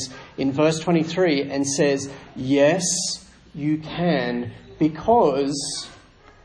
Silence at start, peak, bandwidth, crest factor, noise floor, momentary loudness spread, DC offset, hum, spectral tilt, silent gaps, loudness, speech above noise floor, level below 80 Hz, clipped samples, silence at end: 0 s; -4 dBFS; 10.5 kHz; 18 dB; -49 dBFS; 14 LU; under 0.1%; none; -4.5 dB/octave; none; -22 LUFS; 28 dB; -54 dBFS; under 0.1%; 0.5 s